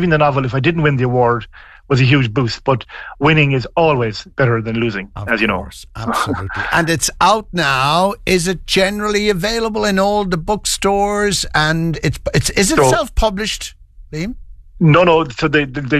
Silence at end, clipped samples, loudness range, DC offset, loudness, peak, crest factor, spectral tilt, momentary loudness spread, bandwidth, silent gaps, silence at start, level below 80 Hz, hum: 0 s; under 0.1%; 2 LU; under 0.1%; -15 LUFS; -2 dBFS; 14 dB; -4.5 dB/octave; 9 LU; 13.5 kHz; none; 0 s; -32 dBFS; none